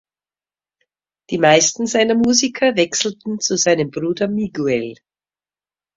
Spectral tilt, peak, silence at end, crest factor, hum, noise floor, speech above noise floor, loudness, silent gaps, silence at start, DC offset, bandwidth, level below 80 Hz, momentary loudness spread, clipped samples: -3 dB/octave; 0 dBFS; 1.05 s; 18 dB; none; under -90 dBFS; over 73 dB; -17 LUFS; none; 1.3 s; under 0.1%; 7.8 kHz; -58 dBFS; 9 LU; under 0.1%